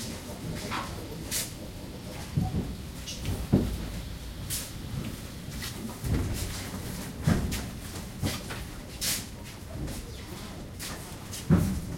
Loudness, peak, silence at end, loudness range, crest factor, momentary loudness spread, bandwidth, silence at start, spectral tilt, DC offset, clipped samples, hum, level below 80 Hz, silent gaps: -33 LUFS; -8 dBFS; 0 s; 3 LU; 24 dB; 12 LU; 16.5 kHz; 0 s; -4.5 dB/octave; under 0.1%; under 0.1%; none; -42 dBFS; none